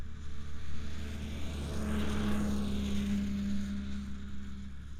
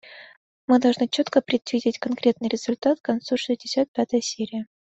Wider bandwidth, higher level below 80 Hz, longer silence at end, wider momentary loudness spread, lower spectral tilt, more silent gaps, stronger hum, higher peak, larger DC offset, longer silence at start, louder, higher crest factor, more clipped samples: first, 14.5 kHz vs 8.2 kHz; first, -42 dBFS vs -68 dBFS; second, 0 s vs 0.3 s; first, 12 LU vs 9 LU; first, -6 dB/octave vs -4 dB/octave; second, none vs 0.37-0.68 s, 3.00-3.04 s, 3.88-3.94 s; neither; second, -22 dBFS vs -6 dBFS; neither; about the same, 0 s vs 0.05 s; second, -37 LUFS vs -23 LUFS; second, 12 dB vs 18 dB; neither